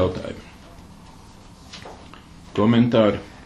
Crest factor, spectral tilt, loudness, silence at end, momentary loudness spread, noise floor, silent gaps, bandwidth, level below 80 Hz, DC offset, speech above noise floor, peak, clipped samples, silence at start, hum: 18 dB; -7.5 dB/octave; -20 LUFS; 0 s; 26 LU; -45 dBFS; none; 10.5 kHz; -48 dBFS; under 0.1%; 26 dB; -4 dBFS; under 0.1%; 0 s; none